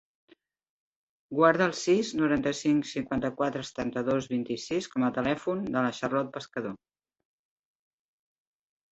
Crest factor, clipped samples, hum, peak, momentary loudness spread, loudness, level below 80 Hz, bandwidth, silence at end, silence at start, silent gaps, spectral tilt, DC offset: 22 dB; under 0.1%; none; -8 dBFS; 11 LU; -28 LUFS; -62 dBFS; 8.2 kHz; 2.15 s; 1.3 s; none; -5.5 dB/octave; under 0.1%